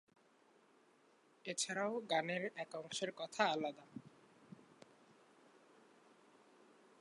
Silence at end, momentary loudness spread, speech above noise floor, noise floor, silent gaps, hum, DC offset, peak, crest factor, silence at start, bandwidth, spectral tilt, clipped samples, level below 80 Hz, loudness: 2.4 s; 23 LU; 30 dB; -71 dBFS; none; none; under 0.1%; -20 dBFS; 26 dB; 1.45 s; 11 kHz; -2.5 dB/octave; under 0.1%; under -90 dBFS; -41 LUFS